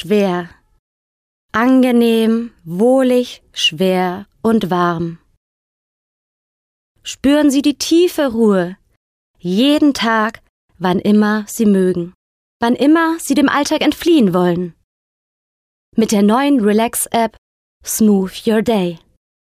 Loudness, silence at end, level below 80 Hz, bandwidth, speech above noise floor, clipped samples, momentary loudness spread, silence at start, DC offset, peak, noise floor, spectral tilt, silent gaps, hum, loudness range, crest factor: -15 LUFS; 0.6 s; -52 dBFS; 16 kHz; over 76 dB; under 0.1%; 11 LU; 0 s; under 0.1%; -4 dBFS; under -90 dBFS; -5 dB/octave; 0.79-1.49 s, 5.37-6.95 s, 8.97-9.34 s, 10.49-10.68 s, 12.15-12.60 s, 14.84-15.92 s, 17.38-17.80 s; none; 4 LU; 12 dB